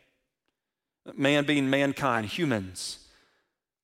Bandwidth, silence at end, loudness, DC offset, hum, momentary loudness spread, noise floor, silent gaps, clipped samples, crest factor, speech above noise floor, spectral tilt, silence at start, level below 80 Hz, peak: 15.5 kHz; 0.9 s; -27 LUFS; under 0.1%; none; 13 LU; -88 dBFS; none; under 0.1%; 20 dB; 61 dB; -5 dB/octave; 1.05 s; -66 dBFS; -10 dBFS